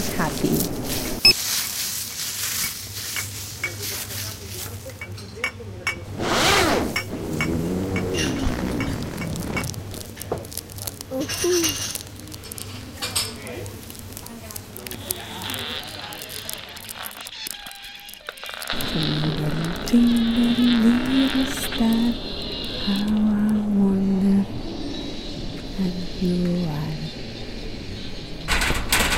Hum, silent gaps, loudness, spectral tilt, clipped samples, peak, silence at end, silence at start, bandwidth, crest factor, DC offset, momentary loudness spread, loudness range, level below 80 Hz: none; none; -24 LUFS; -4 dB/octave; under 0.1%; -2 dBFS; 0 s; 0 s; 17 kHz; 24 dB; under 0.1%; 15 LU; 10 LU; -38 dBFS